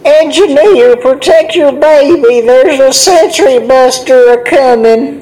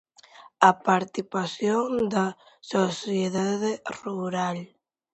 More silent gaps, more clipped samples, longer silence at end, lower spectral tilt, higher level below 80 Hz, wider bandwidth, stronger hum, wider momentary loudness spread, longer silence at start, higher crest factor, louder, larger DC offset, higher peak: neither; first, 10% vs under 0.1%; second, 0 s vs 0.5 s; second, -2.5 dB/octave vs -5 dB/octave; first, -44 dBFS vs -68 dBFS; first, over 20 kHz vs 8.2 kHz; neither; second, 2 LU vs 11 LU; second, 0.05 s vs 0.4 s; second, 6 dB vs 24 dB; first, -5 LUFS vs -26 LUFS; neither; about the same, 0 dBFS vs -2 dBFS